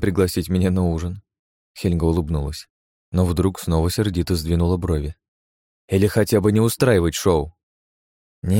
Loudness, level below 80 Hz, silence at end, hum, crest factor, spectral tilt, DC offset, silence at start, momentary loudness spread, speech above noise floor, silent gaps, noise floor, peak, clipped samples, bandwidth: -20 LUFS; -34 dBFS; 0 s; none; 16 dB; -6.5 dB/octave; under 0.1%; 0 s; 11 LU; over 71 dB; 1.39-1.75 s, 2.70-3.12 s, 5.28-5.88 s, 7.63-8.42 s; under -90 dBFS; -4 dBFS; under 0.1%; 17 kHz